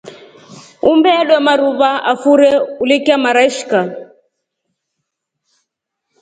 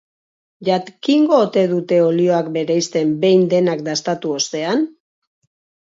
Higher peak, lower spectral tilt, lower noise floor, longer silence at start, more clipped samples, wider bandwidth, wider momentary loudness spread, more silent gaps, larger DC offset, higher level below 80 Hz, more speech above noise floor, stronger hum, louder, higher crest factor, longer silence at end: about the same, 0 dBFS vs -2 dBFS; about the same, -4 dB/octave vs -5 dB/octave; second, -75 dBFS vs under -90 dBFS; second, 0.05 s vs 0.6 s; neither; first, 9.4 kHz vs 7.8 kHz; about the same, 7 LU vs 7 LU; neither; neither; first, -60 dBFS vs -68 dBFS; second, 63 dB vs over 74 dB; neither; first, -12 LUFS vs -17 LUFS; about the same, 14 dB vs 16 dB; first, 2.2 s vs 1.05 s